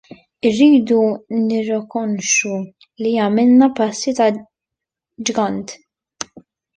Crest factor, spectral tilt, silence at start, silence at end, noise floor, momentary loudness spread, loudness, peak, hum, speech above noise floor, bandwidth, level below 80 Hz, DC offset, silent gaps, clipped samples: 16 dB; -4 dB/octave; 0.45 s; 1 s; -84 dBFS; 18 LU; -16 LUFS; -2 dBFS; none; 68 dB; 10.5 kHz; -62 dBFS; under 0.1%; none; under 0.1%